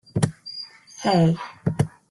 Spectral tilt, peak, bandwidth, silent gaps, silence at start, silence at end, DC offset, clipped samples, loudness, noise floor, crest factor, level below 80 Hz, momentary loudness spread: -6.5 dB/octave; -8 dBFS; 12 kHz; none; 0.15 s; 0.25 s; under 0.1%; under 0.1%; -23 LUFS; -40 dBFS; 16 dB; -54 dBFS; 15 LU